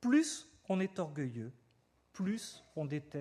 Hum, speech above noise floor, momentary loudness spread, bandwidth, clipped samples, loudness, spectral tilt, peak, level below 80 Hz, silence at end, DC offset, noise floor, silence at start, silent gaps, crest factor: none; 36 dB; 14 LU; 13 kHz; under 0.1%; -38 LUFS; -5.5 dB/octave; -20 dBFS; -78 dBFS; 0 s; under 0.1%; -72 dBFS; 0 s; none; 18 dB